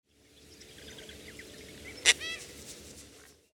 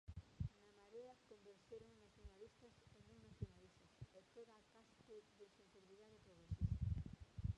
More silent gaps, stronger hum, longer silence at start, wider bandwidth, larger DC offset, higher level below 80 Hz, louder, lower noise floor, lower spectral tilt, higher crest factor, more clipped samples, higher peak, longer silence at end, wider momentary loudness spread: neither; neither; first, 0.35 s vs 0.1 s; first, 20 kHz vs 10.5 kHz; neither; about the same, -62 dBFS vs -58 dBFS; first, -27 LUFS vs -54 LUFS; second, -59 dBFS vs -70 dBFS; second, 0.5 dB/octave vs -8 dB/octave; first, 36 dB vs 24 dB; neither; first, 0 dBFS vs -30 dBFS; first, 0.2 s vs 0 s; first, 25 LU vs 21 LU